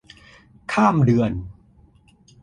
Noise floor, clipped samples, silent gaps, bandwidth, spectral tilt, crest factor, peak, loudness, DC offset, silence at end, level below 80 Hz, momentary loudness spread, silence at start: -54 dBFS; under 0.1%; none; 11 kHz; -8 dB/octave; 18 dB; -4 dBFS; -19 LUFS; under 0.1%; 0.9 s; -46 dBFS; 21 LU; 0.7 s